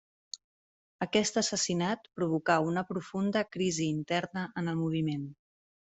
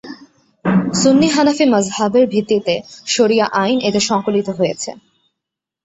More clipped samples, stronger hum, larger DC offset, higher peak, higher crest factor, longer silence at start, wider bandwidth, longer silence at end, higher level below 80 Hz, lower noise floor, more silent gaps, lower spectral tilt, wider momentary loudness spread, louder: neither; neither; neither; second, -12 dBFS vs -2 dBFS; first, 20 dB vs 14 dB; first, 0.35 s vs 0.05 s; about the same, 8.2 kHz vs 8.2 kHz; second, 0.55 s vs 0.9 s; second, -70 dBFS vs -54 dBFS; first, under -90 dBFS vs -82 dBFS; first, 0.44-0.99 s vs none; about the same, -4.5 dB/octave vs -4.5 dB/octave; first, 12 LU vs 9 LU; second, -31 LUFS vs -15 LUFS